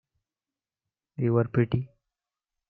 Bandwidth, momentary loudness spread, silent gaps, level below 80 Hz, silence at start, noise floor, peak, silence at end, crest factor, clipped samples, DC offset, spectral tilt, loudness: 4.5 kHz; 19 LU; none; -60 dBFS; 1.2 s; under -90 dBFS; -10 dBFS; 0.85 s; 20 dB; under 0.1%; under 0.1%; -11.5 dB/octave; -27 LUFS